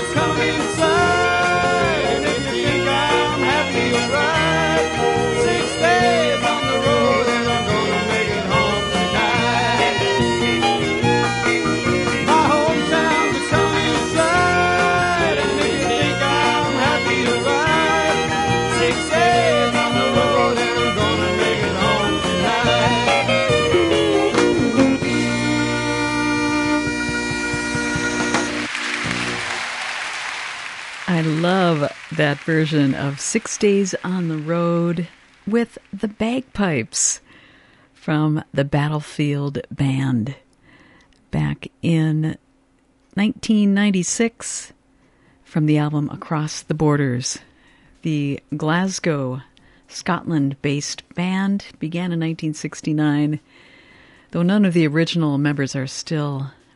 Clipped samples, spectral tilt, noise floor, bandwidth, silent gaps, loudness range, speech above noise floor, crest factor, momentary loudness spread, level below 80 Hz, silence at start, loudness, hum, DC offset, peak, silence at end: under 0.1%; -4.5 dB/octave; -58 dBFS; 11.5 kHz; none; 6 LU; 38 dB; 16 dB; 9 LU; -42 dBFS; 0 s; -19 LUFS; none; under 0.1%; -2 dBFS; 0.25 s